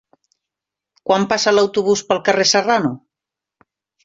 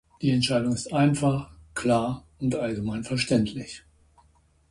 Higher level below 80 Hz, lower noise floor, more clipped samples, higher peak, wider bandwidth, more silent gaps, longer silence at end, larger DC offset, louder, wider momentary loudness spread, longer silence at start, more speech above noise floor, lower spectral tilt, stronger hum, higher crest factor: second, -60 dBFS vs -52 dBFS; first, -86 dBFS vs -62 dBFS; neither; first, 0 dBFS vs -10 dBFS; second, 7.8 kHz vs 11.5 kHz; neither; first, 1.1 s vs 0.9 s; neither; first, -16 LUFS vs -26 LUFS; about the same, 9 LU vs 11 LU; first, 1.05 s vs 0.2 s; first, 70 dB vs 37 dB; second, -3 dB/octave vs -5.5 dB/octave; neither; about the same, 18 dB vs 16 dB